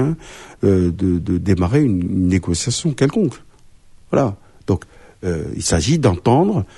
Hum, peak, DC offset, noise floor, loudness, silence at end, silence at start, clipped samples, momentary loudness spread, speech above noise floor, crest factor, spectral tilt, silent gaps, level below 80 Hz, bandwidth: none; -2 dBFS; under 0.1%; -45 dBFS; -18 LUFS; 0.1 s; 0 s; under 0.1%; 8 LU; 27 dB; 16 dB; -6 dB/octave; none; -38 dBFS; 11.5 kHz